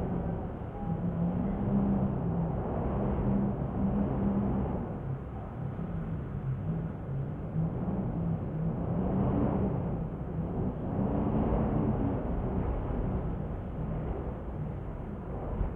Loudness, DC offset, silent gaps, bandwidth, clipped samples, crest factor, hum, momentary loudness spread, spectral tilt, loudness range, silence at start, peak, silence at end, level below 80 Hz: -33 LUFS; under 0.1%; none; 3.6 kHz; under 0.1%; 14 dB; none; 8 LU; -12 dB/octave; 4 LU; 0 s; -16 dBFS; 0 s; -40 dBFS